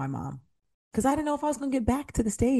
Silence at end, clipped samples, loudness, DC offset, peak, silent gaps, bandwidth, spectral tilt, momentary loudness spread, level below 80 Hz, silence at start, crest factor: 0 s; under 0.1%; -28 LUFS; under 0.1%; -10 dBFS; 0.74-0.91 s; 12.5 kHz; -6 dB/octave; 11 LU; -44 dBFS; 0 s; 18 dB